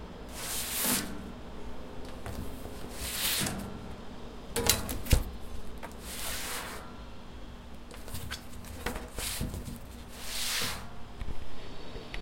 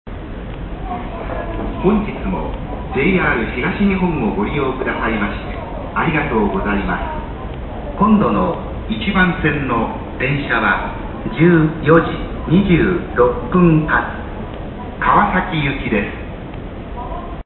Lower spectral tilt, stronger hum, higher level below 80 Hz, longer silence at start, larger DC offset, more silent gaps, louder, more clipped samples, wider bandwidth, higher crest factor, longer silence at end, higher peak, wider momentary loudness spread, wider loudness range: second, -2.5 dB/octave vs -11.5 dB/octave; neither; second, -42 dBFS vs -30 dBFS; about the same, 0 s vs 0.05 s; neither; neither; second, -34 LUFS vs -17 LUFS; neither; first, 16.5 kHz vs 4.2 kHz; first, 32 dB vs 18 dB; about the same, 0 s vs 0.05 s; about the same, -2 dBFS vs 0 dBFS; about the same, 17 LU vs 15 LU; first, 8 LU vs 5 LU